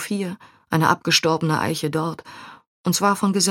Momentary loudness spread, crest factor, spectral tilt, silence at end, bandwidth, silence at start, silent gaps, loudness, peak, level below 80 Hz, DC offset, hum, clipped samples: 19 LU; 20 dB; -4 dB/octave; 0 s; 17.5 kHz; 0 s; 2.67-2.84 s; -21 LUFS; -2 dBFS; -62 dBFS; under 0.1%; none; under 0.1%